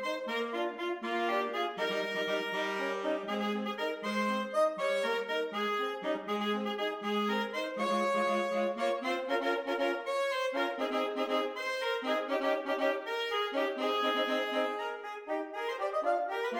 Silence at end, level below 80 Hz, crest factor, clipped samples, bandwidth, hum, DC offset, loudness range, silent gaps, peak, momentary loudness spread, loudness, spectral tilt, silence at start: 0 s; -82 dBFS; 14 dB; under 0.1%; 17.5 kHz; none; under 0.1%; 1 LU; none; -18 dBFS; 5 LU; -33 LUFS; -4 dB/octave; 0 s